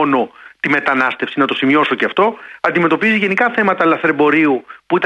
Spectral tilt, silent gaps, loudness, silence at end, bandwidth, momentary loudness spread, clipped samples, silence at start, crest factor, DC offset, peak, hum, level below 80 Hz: -6.5 dB/octave; none; -15 LUFS; 0 s; 9.2 kHz; 6 LU; under 0.1%; 0 s; 14 dB; under 0.1%; -2 dBFS; none; -62 dBFS